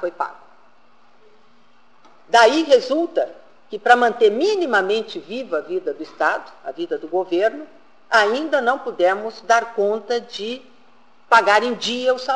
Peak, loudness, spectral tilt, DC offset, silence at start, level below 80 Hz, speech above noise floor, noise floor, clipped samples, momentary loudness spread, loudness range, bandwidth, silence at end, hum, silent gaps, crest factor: -2 dBFS; -19 LUFS; -3 dB/octave; 0.4%; 0 s; -68 dBFS; 38 dB; -56 dBFS; under 0.1%; 15 LU; 5 LU; 11 kHz; 0 s; none; none; 18 dB